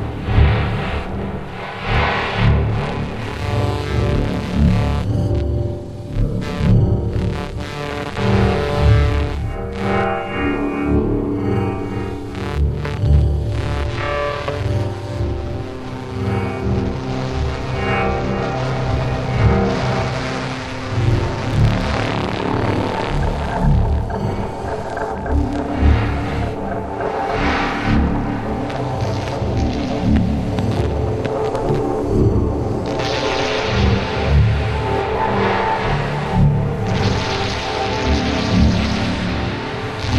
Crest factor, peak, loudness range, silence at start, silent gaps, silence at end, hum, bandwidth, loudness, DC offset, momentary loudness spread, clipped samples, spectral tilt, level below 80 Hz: 18 dB; 0 dBFS; 3 LU; 0 s; none; 0 s; none; 11 kHz; -19 LUFS; under 0.1%; 8 LU; under 0.1%; -7 dB/octave; -24 dBFS